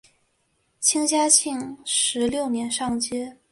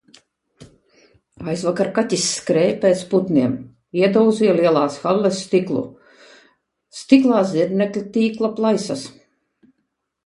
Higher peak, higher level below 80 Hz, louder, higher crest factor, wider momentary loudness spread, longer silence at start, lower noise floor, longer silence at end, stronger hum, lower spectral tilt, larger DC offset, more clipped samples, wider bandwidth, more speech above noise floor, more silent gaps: about the same, -2 dBFS vs 0 dBFS; about the same, -60 dBFS vs -62 dBFS; second, -22 LUFS vs -18 LUFS; about the same, 22 dB vs 20 dB; about the same, 12 LU vs 12 LU; first, 0.8 s vs 0.6 s; second, -69 dBFS vs -74 dBFS; second, 0.2 s vs 1.15 s; neither; second, -1.5 dB/octave vs -5.5 dB/octave; neither; neither; about the same, 12 kHz vs 11.5 kHz; second, 46 dB vs 56 dB; neither